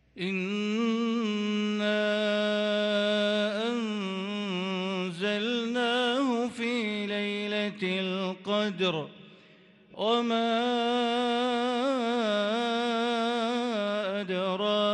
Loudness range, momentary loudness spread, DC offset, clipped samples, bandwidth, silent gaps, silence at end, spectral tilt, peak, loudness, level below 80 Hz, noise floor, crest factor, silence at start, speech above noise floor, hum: 3 LU; 5 LU; under 0.1%; under 0.1%; 10.5 kHz; none; 0 s; -5 dB/octave; -14 dBFS; -28 LUFS; -76 dBFS; -57 dBFS; 14 dB; 0.15 s; 29 dB; none